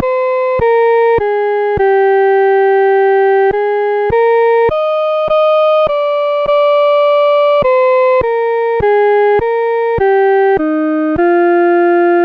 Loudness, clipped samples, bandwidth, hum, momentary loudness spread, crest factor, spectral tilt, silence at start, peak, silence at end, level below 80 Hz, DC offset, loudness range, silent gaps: -11 LUFS; under 0.1%; 5.2 kHz; none; 4 LU; 6 dB; -7.5 dB/octave; 0 s; -4 dBFS; 0 s; -40 dBFS; under 0.1%; 1 LU; none